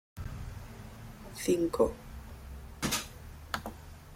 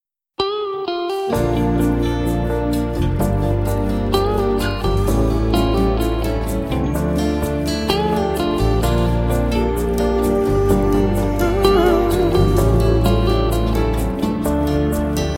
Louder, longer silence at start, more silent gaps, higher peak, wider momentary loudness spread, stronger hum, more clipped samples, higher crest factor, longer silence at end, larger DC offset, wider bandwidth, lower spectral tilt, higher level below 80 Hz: second, -34 LUFS vs -18 LUFS; second, 0.15 s vs 0.4 s; neither; second, -12 dBFS vs 0 dBFS; first, 18 LU vs 5 LU; neither; neither; first, 24 dB vs 16 dB; about the same, 0 s vs 0 s; neither; about the same, 16.5 kHz vs 16.5 kHz; second, -4.5 dB/octave vs -6.5 dB/octave; second, -48 dBFS vs -24 dBFS